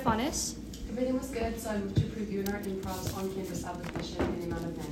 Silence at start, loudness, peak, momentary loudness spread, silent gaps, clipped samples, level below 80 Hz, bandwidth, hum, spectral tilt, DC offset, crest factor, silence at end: 0 s; -34 LUFS; -14 dBFS; 6 LU; none; under 0.1%; -46 dBFS; 16 kHz; none; -5 dB/octave; under 0.1%; 20 dB; 0 s